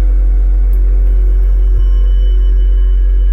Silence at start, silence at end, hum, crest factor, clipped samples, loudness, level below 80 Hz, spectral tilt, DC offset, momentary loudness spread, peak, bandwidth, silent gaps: 0 s; 0 s; none; 4 dB; under 0.1%; -14 LUFS; -8 dBFS; -9 dB/octave; under 0.1%; 0 LU; -4 dBFS; 3.2 kHz; none